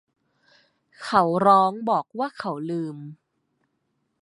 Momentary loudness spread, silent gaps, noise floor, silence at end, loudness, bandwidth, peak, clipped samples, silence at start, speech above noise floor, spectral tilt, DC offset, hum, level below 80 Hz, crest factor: 19 LU; none; -74 dBFS; 1.1 s; -22 LUFS; 11.5 kHz; -4 dBFS; under 0.1%; 1 s; 52 dB; -6.5 dB/octave; under 0.1%; none; -72 dBFS; 22 dB